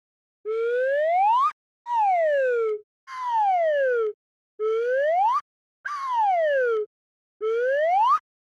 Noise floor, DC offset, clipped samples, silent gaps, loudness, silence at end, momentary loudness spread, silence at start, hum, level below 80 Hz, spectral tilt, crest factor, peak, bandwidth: under -90 dBFS; under 0.1%; under 0.1%; 1.53-1.85 s, 2.83-3.07 s, 4.14-4.58 s, 5.41-5.84 s, 6.86-7.40 s; -23 LUFS; 0.4 s; 12 LU; 0.45 s; none; -86 dBFS; -1 dB/octave; 10 dB; -14 dBFS; 11 kHz